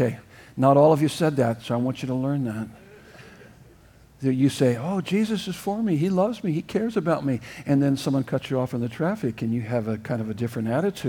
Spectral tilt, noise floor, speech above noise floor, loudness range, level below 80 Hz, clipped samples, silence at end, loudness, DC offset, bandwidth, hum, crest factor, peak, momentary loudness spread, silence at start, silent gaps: -7 dB/octave; -52 dBFS; 29 dB; 4 LU; -58 dBFS; under 0.1%; 0 s; -24 LUFS; under 0.1%; 18 kHz; none; 18 dB; -6 dBFS; 8 LU; 0 s; none